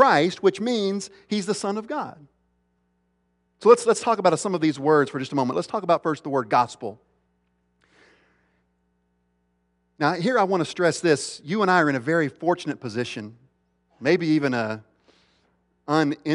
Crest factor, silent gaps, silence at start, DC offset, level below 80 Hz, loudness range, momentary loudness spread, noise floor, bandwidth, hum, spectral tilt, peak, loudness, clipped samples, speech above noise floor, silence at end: 22 dB; none; 0 s; under 0.1%; -70 dBFS; 7 LU; 12 LU; -70 dBFS; 11 kHz; 60 Hz at -55 dBFS; -5 dB/octave; -2 dBFS; -23 LUFS; under 0.1%; 48 dB; 0 s